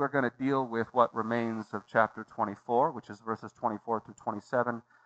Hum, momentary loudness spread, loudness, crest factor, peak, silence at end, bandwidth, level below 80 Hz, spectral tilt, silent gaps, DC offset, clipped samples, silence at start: none; 10 LU; -31 LUFS; 22 dB; -8 dBFS; 0.25 s; 8.2 kHz; -78 dBFS; -7.5 dB/octave; none; under 0.1%; under 0.1%; 0 s